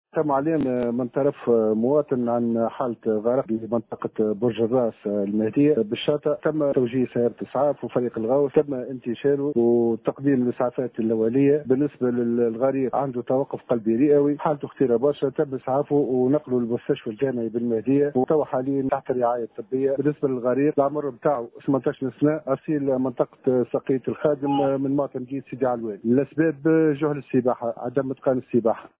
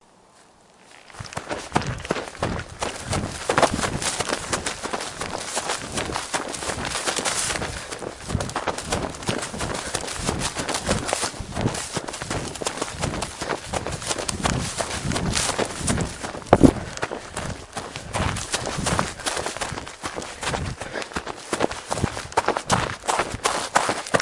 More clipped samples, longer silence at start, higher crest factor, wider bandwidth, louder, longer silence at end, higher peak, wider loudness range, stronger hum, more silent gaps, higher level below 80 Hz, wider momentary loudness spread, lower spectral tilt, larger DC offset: neither; second, 0.15 s vs 0.4 s; second, 16 dB vs 26 dB; second, 4 kHz vs 11.5 kHz; about the same, -23 LUFS vs -25 LUFS; first, 0.15 s vs 0 s; second, -6 dBFS vs 0 dBFS; about the same, 2 LU vs 4 LU; neither; neither; second, -62 dBFS vs -42 dBFS; second, 6 LU vs 9 LU; first, -12 dB/octave vs -3.5 dB/octave; neither